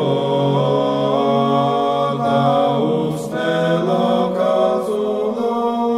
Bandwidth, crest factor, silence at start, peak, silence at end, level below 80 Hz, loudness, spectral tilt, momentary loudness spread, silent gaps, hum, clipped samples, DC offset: 14.5 kHz; 12 dB; 0 s; -4 dBFS; 0 s; -58 dBFS; -17 LUFS; -7 dB/octave; 4 LU; none; none; under 0.1%; under 0.1%